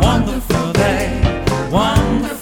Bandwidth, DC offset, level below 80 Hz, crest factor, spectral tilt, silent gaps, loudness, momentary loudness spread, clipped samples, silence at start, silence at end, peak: 19 kHz; under 0.1%; -24 dBFS; 14 dB; -6 dB/octave; none; -16 LUFS; 4 LU; under 0.1%; 0 s; 0 s; -2 dBFS